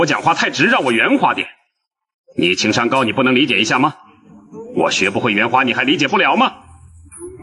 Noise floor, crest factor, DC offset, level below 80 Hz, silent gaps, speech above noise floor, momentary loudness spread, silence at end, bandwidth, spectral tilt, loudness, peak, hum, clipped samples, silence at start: -73 dBFS; 16 dB; under 0.1%; -56 dBFS; 2.14-2.24 s; 58 dB; 10 LU; 0 s; 11.5 kHz; -4 dB/octave; -15 LUFS; -2 dBFS; none; under 0.1%; 0 s